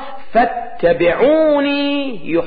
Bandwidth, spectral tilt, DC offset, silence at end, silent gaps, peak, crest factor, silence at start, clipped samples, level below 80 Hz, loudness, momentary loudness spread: 5 kHz; -10.5 dB/octave; under 0.1%; 0 s; none; -4 dBFS; 12 dB; 0 s; under 0.1%; -44 dBFS; -15 LUFS; 7 LU